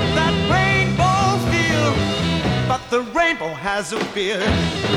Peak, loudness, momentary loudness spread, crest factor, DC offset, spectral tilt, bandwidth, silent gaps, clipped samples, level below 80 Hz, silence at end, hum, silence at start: -6 dBFS; -19 LUFS; 6 LU; 14 dB; under 0.1%; -5 dB/octave; 15 kHz; none; under 0.1%; -36 dBFS; 0 s; none; 0 s